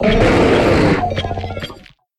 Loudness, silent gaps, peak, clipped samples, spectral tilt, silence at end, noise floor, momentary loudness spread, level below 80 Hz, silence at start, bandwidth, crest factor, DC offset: -14 LUFS; none; 0 dBFS; under 0.1%; -6.5 dB/octave; 0.45 s; -39 dBFS; 15 LU; -28 dBFS; 0 s; 12.5 kHz; 14 dB; under 0.1%